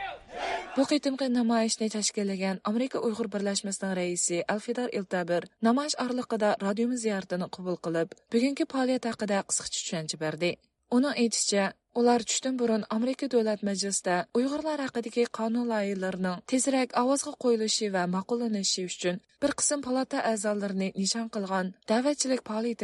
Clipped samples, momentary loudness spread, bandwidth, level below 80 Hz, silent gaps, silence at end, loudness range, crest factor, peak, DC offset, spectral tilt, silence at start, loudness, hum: under 0.1%; 6 LU; 11.5 kHz; -70 dBFS; none; 0 s; 2 LU; 16 dB; -12 dBFS; under 0.1%; -3.5 dB/octave; 0 s; -29 LUFS; none